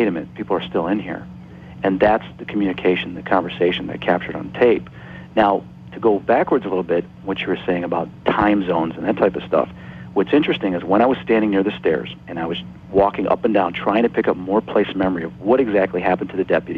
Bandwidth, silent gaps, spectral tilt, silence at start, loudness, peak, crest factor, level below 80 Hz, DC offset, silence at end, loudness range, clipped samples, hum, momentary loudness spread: 5.8 kHz; none; -8.5 dB/octave; 0 s; -20 LUFS; -4 dBFS; 16 dB; -48 dBFS; under 0.1%; 0 s; 2 LU; under 0.1%; none; 10 LU